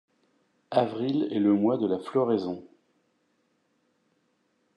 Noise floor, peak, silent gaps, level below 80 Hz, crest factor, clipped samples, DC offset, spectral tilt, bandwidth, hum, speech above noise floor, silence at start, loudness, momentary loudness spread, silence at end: -72 dBFS; -8 dBFS; none; -80 dBFS; 20 dB; under 0.1%; under 0.1%; -8.5 dB/octave; 9.2 kHz; none; 46 dB; 0.7 s; -27 LUFS; 6 LU; 2.1 s